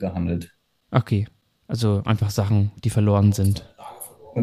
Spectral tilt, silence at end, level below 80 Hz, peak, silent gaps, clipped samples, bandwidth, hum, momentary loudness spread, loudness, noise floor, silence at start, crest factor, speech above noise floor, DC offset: -7 dB/octave; 0 s; -48 dBFS; -4 dBFS; none; under 0.1%; 14.5 kHz; none; 20 LU; -22 LUFS; -41 dBFS; 0 s; 18 dB; 20 dB; under 0.1%